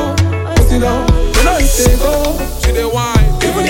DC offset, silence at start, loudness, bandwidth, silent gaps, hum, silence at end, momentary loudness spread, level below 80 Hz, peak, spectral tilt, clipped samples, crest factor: under 0.1%; 0 s; -13 LUFS; 17 kHz; none; none; 0 s; 4 LU; -14 dBFS; 0 dBFS; -5 dB/octave; under 0.1%; 10 dB